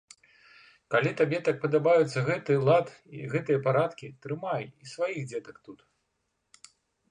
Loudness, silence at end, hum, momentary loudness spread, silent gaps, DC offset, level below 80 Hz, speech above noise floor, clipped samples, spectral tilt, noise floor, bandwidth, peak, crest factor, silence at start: -27 LUFS; 1.35 s; none; 17 LU; none; under 0.1%; -72 dBFS; 51 dB; under 0.1%; -6.5 dB/octave; -78 dBFS; 10.5 kHz; -10 dBFS; 18 dB; 0.9 s